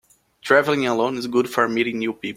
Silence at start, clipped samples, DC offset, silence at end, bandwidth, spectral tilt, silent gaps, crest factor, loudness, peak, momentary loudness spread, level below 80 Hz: 0.45 s; under 0.1%; under 0.1%; 0 s; 16.5 kHz; -5 dB/octave; none; 20 dB; -20 LUFS; -2 dBFS; 7 LU; -62 dBFS